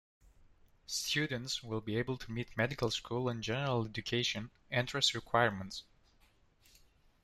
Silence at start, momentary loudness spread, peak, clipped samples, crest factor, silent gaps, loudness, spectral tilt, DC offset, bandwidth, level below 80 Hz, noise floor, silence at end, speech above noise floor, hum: 0.9 s; 9 LU; -14 dBFS; under 0.1%; 22 dB; none; -35 LUFS; -4 dB/octave; under 0.1%; 14 kHz; -62 dBFS; -68 dBFS; 1.4 s; 32 dB; none